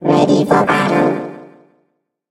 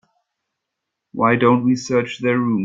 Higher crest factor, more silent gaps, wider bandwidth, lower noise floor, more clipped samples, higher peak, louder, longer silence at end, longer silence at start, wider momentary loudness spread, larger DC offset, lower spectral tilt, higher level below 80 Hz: about the same, 16 dB vs 18 dB; neither; first, 12.5 kHz vs 7.6 kHz; second, -66 dBFS vs -80 dBFS; neither; about the same, 0 dBFS vs -2 dBFS; first, -14 LUFS vs -18 LUFS; first, 0.85 s vs 0 s; second, 0 s vs 1.15 s; first, 11 LU vs 6 LU; neither; about the same, -6.5 dB/octave vs -6.5 dB/octave; first, -54 dBFS vs -60 dBFS